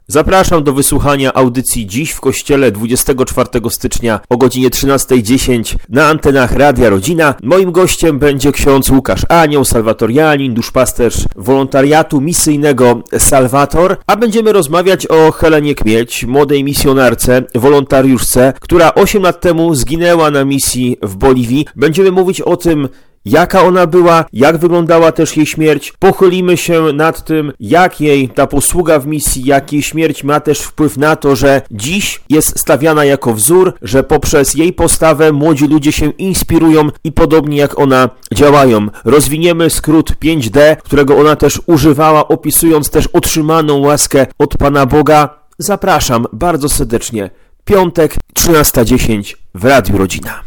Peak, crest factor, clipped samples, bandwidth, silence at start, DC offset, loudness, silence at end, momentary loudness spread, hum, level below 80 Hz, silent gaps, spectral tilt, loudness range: 0 dBFS; 10 dB; 0.3%; 19.5 kHz; 0.1 s; under 0.1%; -9 LUFS; 0 s; 6 LU; none; -26 dBFS; none; -5 dB/octave; 3 LU